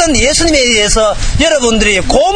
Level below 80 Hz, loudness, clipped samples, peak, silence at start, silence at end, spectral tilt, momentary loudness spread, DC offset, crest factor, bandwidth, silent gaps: -18 dBFS; -9 LUFS; 0.1%; 0 dBFS; 0 s; 0 s; -2.5 dB/octave; 3 LU; under 0.1%; 10 dB; 10 kHz; none